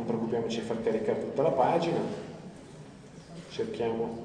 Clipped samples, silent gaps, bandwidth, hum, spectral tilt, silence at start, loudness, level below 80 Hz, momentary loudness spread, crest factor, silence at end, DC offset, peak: under 0.1%; none; 10 kHz; none; -6.5 dB/octave; 0 s; -30 LUFS; -62 dBFS; 22 LU; 20 dB; 0 s; under 0.1%; -10 dBFS